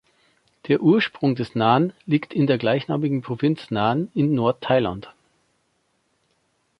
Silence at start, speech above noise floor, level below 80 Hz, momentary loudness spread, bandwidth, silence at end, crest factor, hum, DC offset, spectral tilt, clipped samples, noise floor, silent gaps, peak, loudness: 0.65 s; 48 dB; -58 dBFS; 5 LU; 6 kHz; 1.7 s; 20 dB; none; under 0.1%; -8.5 dB/octave; under 0.1%; -69 dBFS; none; -4 dBFS; -21 LUFS